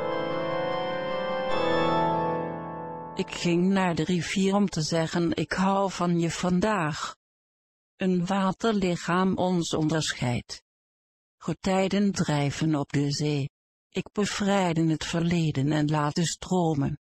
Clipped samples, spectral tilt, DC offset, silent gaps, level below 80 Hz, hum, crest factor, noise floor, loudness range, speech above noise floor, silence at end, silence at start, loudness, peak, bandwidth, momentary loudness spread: under 0.1%; -5.5 dB/octave; under 0.1%; 7.16-7.98 s, 10.62-11.38 s, 13.50-13.90 s; -54 dBFS; none; 14 dB; under -90 dBFS; 2 LU; over 64 dB; 0.1 s; 0 s; -27 LUFS; -12 dBFS; 12 kHz; 9 LU